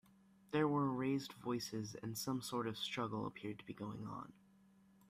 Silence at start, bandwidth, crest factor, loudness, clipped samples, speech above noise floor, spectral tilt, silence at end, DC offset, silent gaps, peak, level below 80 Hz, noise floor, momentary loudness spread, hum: 0.5 s; 15.5 kHz; 20 dB; -42 LUFS; under 0.1%; 24 dB; -5.5 dB/octave; 0.75 s; under 0.1%; none; -22 dBFS; -76 dBFS; -69 dBFS; 12 LU; none